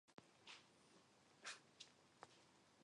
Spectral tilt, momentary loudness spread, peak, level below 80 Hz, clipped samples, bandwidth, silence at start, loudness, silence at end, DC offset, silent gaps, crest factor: -1 dB/octave; 10 LU; -40 dBFS; under -90 dBFS; under 0.1%; 11 kHz; 0.05 s; -61 LUFS; 0 s; under 0.1%; none; 26 dB